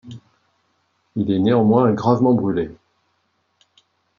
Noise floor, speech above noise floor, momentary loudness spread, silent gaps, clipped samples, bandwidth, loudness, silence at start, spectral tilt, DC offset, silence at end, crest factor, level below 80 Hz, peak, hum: -68 dBFS; 51 dB; 16 LU; none; under 0.1%; 7 kHz; -18 LUFS; 0.05 s; -9 dB/octave; under 0.1%; 1.45 s; 18 dB; -58 dBFS; -4 dBFS; none